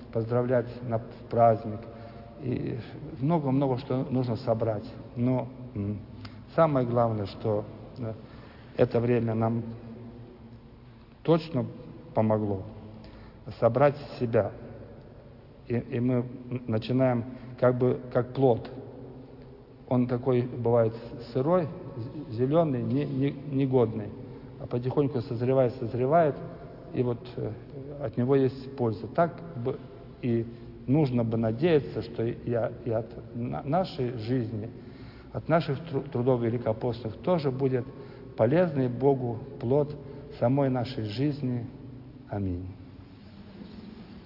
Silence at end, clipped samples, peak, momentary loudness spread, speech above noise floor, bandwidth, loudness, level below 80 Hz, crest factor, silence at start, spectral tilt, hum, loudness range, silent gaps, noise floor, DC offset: 0 s; under 0.1%; -8 dBFS; 20 LU; 23 dB; 5.8 kHz; -28 LUFS; -56 dBFS; 20 dB; 0 s; -10.5 dB/octave; none; 4 LU; none; -50 dBFS; under 0.1%